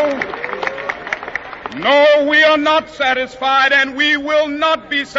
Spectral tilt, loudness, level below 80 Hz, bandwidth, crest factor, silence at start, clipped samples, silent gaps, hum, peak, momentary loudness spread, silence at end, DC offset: 0.5 dB/octave; -14 LUFS; -52 dBFS; 7.8 kHz; 16 dB; 0 s; under 0.1%; none; none; 0 dBFS; 13 LU; 0 s; under 0.1%